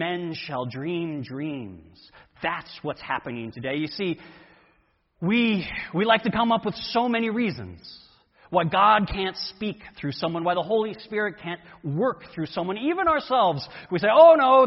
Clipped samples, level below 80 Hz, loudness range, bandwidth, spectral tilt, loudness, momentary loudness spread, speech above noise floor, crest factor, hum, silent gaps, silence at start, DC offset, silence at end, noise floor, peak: under 0.1%; -54 dBFS; 8 LU; 6 kHz; -8.5 dB/octave; -24 LUFS; 15 LU; 42 dB; 20 dB; none; none; 0 s; under 0.1%; 0 s; -65 dBFS; -4 dBFS